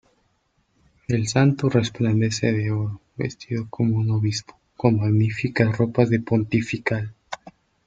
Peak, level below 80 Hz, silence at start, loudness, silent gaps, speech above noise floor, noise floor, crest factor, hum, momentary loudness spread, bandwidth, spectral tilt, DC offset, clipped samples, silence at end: -2 dBFS; -54 dBFS; 1.1 s; -22 LUFS; none; 46 dB; -67 dBFS; 20 dB; none; 11 LU; 9 kHz; -6.5 dB/octave; under 0.1%; under 0.1%; 0.35 s